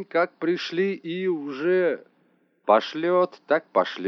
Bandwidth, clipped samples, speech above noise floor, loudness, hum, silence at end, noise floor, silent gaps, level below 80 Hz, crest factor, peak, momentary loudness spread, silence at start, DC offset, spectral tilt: 6.4 kHz; under 0.1%; 41 dB; -24 LUFS; none; 0 s; -65 dBFS; none; under -90 dBFS; 18 dB; -6 dBFS; 6 LU; 0 s; under 0.1%; -6 dB/octave